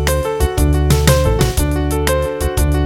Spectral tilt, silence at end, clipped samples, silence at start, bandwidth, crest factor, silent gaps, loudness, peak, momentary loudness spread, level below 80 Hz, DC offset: -5.5 dB/octave; 0 s; under 0.1%; 0 s; 17 kHz; 14 dB; none; -15 LUFS; 0 dBFS; 5 LU; -18 dBFS; 0.2%